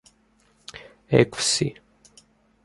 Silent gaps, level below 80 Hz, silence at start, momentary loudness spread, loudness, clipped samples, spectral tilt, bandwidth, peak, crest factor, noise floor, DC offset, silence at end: none; -56 dBFS; 0.75 s; 24 LU; -22 LUFS; under 0.1%; -4 dB/octave; 11.5 kHz; -2 dBFS; 24 dB; -62 dBFS; under 0.1%; 0.9 s